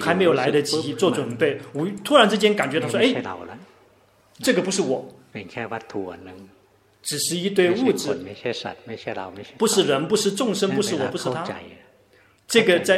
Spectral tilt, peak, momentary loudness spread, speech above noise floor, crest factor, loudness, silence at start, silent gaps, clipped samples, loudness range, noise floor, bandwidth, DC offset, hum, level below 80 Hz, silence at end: -4 dB/octave; 0 dBFS; 16 LU; 35 dB; 22 dB; -22 LUFS; 0 s; none; under 0.1%; 7 LU; -57 dBFS; 16 kHz; under 0.1%; none; -66 dBFS; 0 s